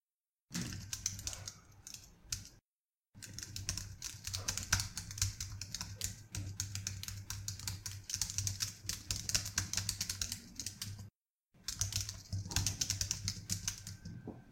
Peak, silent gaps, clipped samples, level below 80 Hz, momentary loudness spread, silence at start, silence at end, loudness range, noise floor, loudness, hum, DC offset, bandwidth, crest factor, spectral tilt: -14 dBFS; 2.66-2.89 s, 2.99-3.03 s, 11.15-11.36 s; under 0.1%; -54 dBFS; 14 LU; 0.5 s; 0 s; 6 LU; under -90 dBFS; -39 LUFS; none; under 0.1%; 17 kHz; 30 dB; -1.5 dB/octave